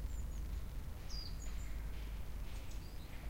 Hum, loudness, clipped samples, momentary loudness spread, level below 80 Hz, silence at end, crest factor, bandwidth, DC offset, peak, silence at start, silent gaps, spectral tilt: none; -48 LUFS; under 0.1%; 3 LU; -44 dBFS; 0 s; 12 dB; 16.5 kHz; under 0.1%; -30 dBFS; 0 s; none; -4.5 dB/octave